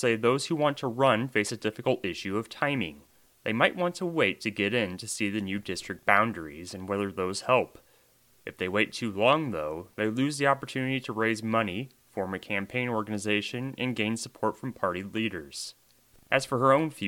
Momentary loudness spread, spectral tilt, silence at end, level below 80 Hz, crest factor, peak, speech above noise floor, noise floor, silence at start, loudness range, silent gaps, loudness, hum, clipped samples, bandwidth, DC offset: 11 LU; -4.5 dB/octave; 0 s; -66 dBFS; 26 dB; -4 dBFS; 34 dB; -63 dBFS; 0 s; 3 LU; none; -28 LUFS; none; under 0.1%; 18.5 kHz; under 0.1%